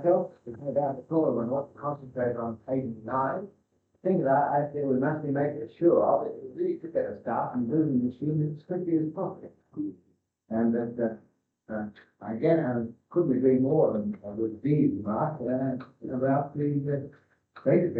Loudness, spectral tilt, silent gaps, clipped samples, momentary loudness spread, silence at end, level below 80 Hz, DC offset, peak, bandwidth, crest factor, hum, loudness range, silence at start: -28 LUFS; -12 dB/octave; none; under 0.1%; 13 LU; 0 s; -68 dBFS; under 0.1%; -10 dBFS; 4.4 kHz; 18 dB; none; 4 LU; 0 s